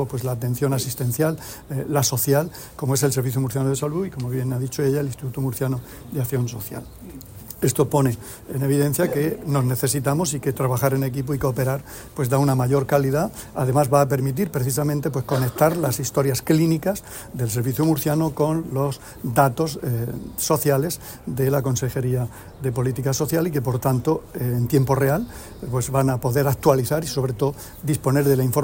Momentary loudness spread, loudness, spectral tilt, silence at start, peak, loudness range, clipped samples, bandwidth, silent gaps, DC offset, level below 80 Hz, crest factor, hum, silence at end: 10 LU; -22 LUFS; -6 dB/octave; 0 s; -4 dBFS; 4 LU; under 0.1%; 16.5 kHz; none; under 0.1%; -46 dBFS; 18 dB; none; 0 s